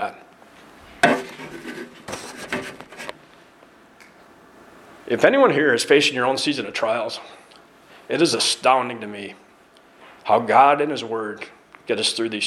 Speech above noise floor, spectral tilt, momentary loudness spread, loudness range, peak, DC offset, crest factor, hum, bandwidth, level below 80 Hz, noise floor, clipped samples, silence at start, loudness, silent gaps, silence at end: 32 dB; -3 dB/octave; 20 LU; 14 LU; 0 dBFS; under 0.1%; 22 dB; none; 14.5 kHz; -64 dBFS; -52 dBFS; under 0.1%; 0 s; -20 LUFS; none; 0 s